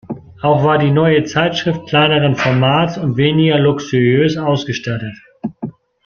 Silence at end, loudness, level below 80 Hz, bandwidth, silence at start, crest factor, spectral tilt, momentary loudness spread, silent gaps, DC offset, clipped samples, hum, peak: 0.35 s; -14 LUFS; -50 dBFS; 7 kHz; 0.1 s; 14 dB; -6.5 dB/octave; 15 LU; none; under 0.1%; under 0.1%; none; 0 dBFS